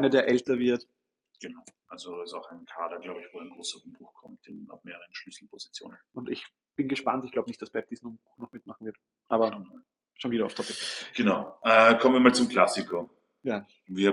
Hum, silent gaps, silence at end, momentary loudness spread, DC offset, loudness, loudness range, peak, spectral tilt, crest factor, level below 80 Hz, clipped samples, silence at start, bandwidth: none; none; 0 s; 24 LU; under 0.1%; -27 LUFS; 17 LU; -4 dBFS; -4.5 dB/octave; 24 dB; -72 dBFS; under 0.1%; 0 s; 11.5 kHz